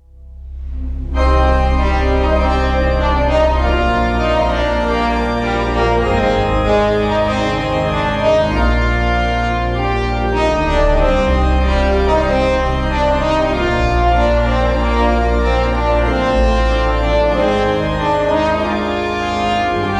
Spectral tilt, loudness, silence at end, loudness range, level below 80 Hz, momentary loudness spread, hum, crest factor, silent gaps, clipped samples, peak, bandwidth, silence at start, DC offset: -6.5 dB/octave; -15 LUFS; 0 s; 1 LU; -20 dBFS; 3 LU; none; 12 dB; none; under 0.1%; -2 dBFS; 9 kHz; 0.2 s; under 0.1%